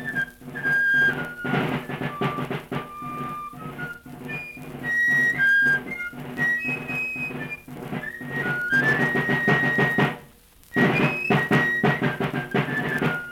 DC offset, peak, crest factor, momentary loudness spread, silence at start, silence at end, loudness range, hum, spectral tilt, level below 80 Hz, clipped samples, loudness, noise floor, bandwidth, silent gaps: under 0.1%; -6 dBFS; 18 dB; 15 LU; 0 s; 0 s; 6 LU; none; -6 dB/octave; -54 dBFS; under 0.1%; -23 LUFS; -51 dBFS; 17 kHz; none